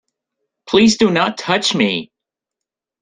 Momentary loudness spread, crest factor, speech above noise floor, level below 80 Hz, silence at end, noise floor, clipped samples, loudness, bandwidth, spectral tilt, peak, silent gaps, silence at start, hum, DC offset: 6 LU; 16 dB; 70 dB; -54 dBFS; 1 s; -84 dBFS; under 0.1%; -15 LUFS; 9.6 kHz; -4 dB/octave; -2 dBFS; none; 0.65 s; none; under 0.1%